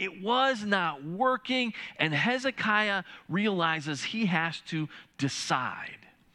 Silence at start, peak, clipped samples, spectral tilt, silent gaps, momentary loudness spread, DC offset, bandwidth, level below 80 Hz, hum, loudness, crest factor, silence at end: 0 s; -10 dBFS; under 0.1%; -4.5 dB/octave; none; 9 LU; under 0.1%; 12 kHz; -74 dBFS; none; -29 LUFS; 20 dB; 0.4 s